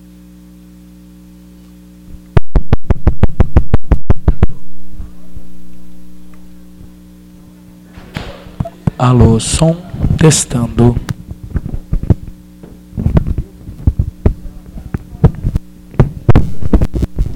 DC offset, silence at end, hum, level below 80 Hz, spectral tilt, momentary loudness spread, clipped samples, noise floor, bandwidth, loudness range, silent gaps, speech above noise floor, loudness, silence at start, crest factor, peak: under 0.1%; 0 s; 60 Hz at -35 dBFS; -20 dBFS; -6 dB/octave; 22 LU; under 0.1%; -37 dBFS; 12.5 kHz; 10 LU; none; 28 dB; -15 LUFS; 2.1 s; 12 dB; 0 dBFS